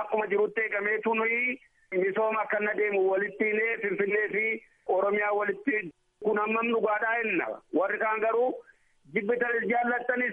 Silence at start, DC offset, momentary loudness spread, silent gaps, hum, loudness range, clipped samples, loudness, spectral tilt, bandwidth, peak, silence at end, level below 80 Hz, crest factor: 0 s; under 0.1%; 5 LU; none; none; 1 LU; under 0.1%; -28 LUFS; -8 dB/octave; 3.7 kHz; -14 dBFS; 0 s; -76 dBFS; 14 dB